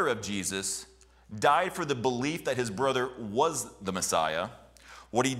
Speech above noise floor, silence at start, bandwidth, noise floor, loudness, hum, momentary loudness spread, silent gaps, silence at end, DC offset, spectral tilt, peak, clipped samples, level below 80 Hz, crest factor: 23 dB; 0 s; 16 kHz; -52 dBFS; -30 LUFS; none; 8 LU; none; 0 s; under 0.1%; -3.5 dB/octave; -10 dBFS; under 0.1%; -60 dBFS; 20 dB